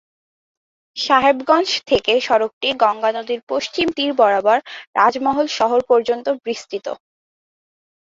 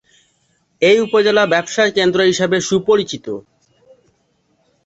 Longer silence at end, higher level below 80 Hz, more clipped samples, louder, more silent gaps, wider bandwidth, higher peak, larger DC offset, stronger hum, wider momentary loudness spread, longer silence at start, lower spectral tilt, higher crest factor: second, 1.15 s vs 1.45 s; about the same, -56 dBFS vs -58 dBFS; neither; second, -18 LUFS vs -15 LUFS; first, 2.53-2.61 s, 3.43-3.47 s, 4.87-4.93 s vs none; about the same, 7.8 kHz vs 8.2 kHz; about the same, 0 dBFS vs -2 dBFS; neither; neither; about the same, 11 LU vs 12 LU; first, 0.95 s vs 0.8 s; about the same, -3 dB/octave vs -4 dB/octave; about the same, 18 dB vs 16 dB